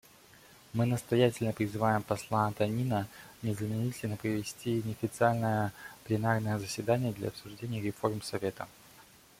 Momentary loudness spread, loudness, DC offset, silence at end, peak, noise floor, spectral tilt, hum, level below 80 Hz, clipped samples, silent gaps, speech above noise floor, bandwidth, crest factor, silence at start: 10 LU; -32 LUFS; under 0.1%; 0.4 s; -12 dBFS; -58 dBFS; -6.5 dB/octave; none; -64 dBFS; under 0.1%; none; 26 dB; 16.5 kHz; 20 dB; 0.75 s